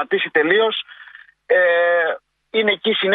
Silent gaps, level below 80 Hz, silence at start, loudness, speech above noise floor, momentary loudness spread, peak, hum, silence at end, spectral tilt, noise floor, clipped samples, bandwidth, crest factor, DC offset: none; -74 dBFS; 0 s; -17 LUFS; 27 dB; 10 LU; -2 dBFS; none; 0 s; -6.5 dB/octave; -44 dBFS; under 0.1%; 4.5 kHz; 18 dB; under 0.1%